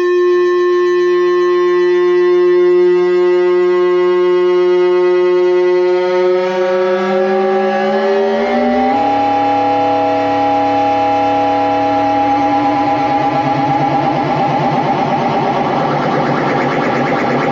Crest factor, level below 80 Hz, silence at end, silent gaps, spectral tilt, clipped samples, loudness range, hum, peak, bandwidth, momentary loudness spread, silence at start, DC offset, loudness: 10 dB; -50 dBFS; 0 s; none; -7 dB/octave; under 0.1%; 3 LU; none; -2 dBFS; 7 kHz; 3 LU; 0 s; under 0.1%; -13 LUFS